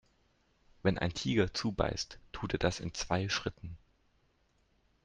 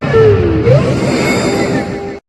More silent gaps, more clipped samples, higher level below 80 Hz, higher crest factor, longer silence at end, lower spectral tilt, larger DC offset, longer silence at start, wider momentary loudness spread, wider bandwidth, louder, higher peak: neither; second, under 0.1% vs 0.2%; second, -52 dBFS vs -32 dBFS; first, 22 dB vs 12 dB; first, 1.25 s vs 0.1 s; second, -5 dB/octave vs -6.5 dB/octave; neither; first, 0.85 s vs 0 s; first, 10 LU vs 7 LU; second, 9.8 kHz vs 12.5 kHz; second, -34 LUFS vs -12 LUFS; second, -14 dBFS vs 0 dBFS